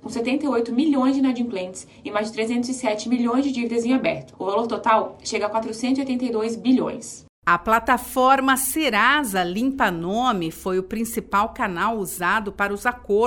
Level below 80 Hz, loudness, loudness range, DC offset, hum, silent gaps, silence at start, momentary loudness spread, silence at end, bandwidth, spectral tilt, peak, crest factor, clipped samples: -50 dBFS; -22 LUFS; 4 LU; under 0.1%; none; 7.29-7.42 s; 0.05 s; 9 LU; 0 s; 17.5 kHz; -4 dB/octave; -4 dBFS; 18 dB; under 0.1%